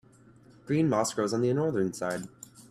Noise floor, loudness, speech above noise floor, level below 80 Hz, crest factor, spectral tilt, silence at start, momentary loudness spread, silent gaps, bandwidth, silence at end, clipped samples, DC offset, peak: -56 dBFS; -29 LUFS; 29 dB; -66 dBFS; 18 dB; -6 dB/octave; 0.65 s; 12 LU; none; 14.5 kHz; 0.1 s; under 0.1%; under 0.1%; -12 dBFS